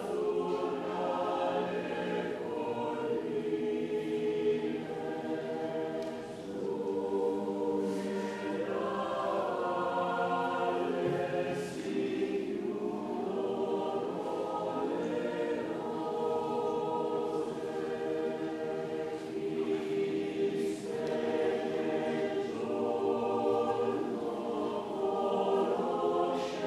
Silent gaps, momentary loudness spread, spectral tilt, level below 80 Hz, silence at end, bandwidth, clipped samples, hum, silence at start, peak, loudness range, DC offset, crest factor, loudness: none; 5 LU; -6 dB/octave; -70 dBFS; 0 s; 13 kHz; under 0.1%; none; 0 s; -18 dBFS; 3 LU; under 0.1%; 14 dB; -34 LUFS